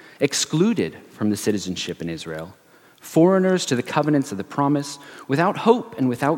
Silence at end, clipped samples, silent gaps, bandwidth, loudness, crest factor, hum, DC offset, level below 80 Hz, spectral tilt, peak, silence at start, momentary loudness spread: 0 s; under 0.1%; none; 17 kHz; -21 LUFS; 20 dB; none; under 0.1%; -62 dBFS; -5 dB/octave; -2 dBFS; 0.2 s; 13 LU